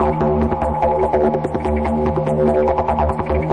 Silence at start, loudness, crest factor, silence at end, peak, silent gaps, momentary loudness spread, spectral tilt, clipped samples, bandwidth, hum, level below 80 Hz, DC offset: 0 s; -18 LUFS; 12 dB; 0 s; -4 dBFS; none; 4 LU; -9 dB/octave; under 0.1%; 10 kHz; none; -28 dBFS; under 0.1%